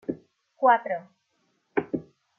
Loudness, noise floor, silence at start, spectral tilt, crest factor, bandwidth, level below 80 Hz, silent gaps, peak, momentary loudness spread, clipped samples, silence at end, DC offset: -27 LUFS; -72 dBFS; 0.1 s; -8 dB/octave; 20 dB; 3.5 kHz; -70 dBFS; none; -8 dBFS; 14 LU; under 0.1%; 0.4 s; under 0.1%